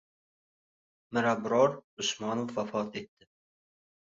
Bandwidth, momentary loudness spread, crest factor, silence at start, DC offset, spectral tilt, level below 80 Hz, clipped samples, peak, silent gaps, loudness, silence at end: 7.8 kHz; 9 LU; 20 dB; 1.1 s; under 0.1%; -4 dB/octave; -74 dBFS; under 0.1%; -12 dBFS; 1.84-1.97 s; -30 LUFS; 1.05 s